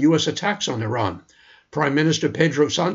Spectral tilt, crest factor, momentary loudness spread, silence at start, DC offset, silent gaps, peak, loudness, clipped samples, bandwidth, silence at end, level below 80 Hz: -5 dB/octave; 18 dB; 8 LU; 0 s; under 0.1%; none; -2 dBFS; -21 LUFS; under 0.1%; 7.8 kHz; 0 s; -58 dBFS